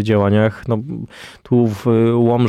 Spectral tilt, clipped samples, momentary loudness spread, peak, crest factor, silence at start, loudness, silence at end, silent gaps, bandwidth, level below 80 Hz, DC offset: -8.5 dB/octave; under 0.1%; 16 LU; -4 dBFS; 12 dB; 0 s; -16 LUFS; 0 s; none; 12.5 kHz; -50 dBFS; under 0.1%